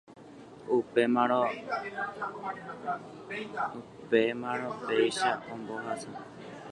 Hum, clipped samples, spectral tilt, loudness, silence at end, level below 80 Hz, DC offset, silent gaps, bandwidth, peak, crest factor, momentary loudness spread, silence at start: none; under 0.1%; -4.5 dB/octave; -31 LUFS; 0 s; -72 dBFS; under 0.1%; none; 11.5 kHz; -12 dBFS; 20 dB; 18 LU; 0.1 s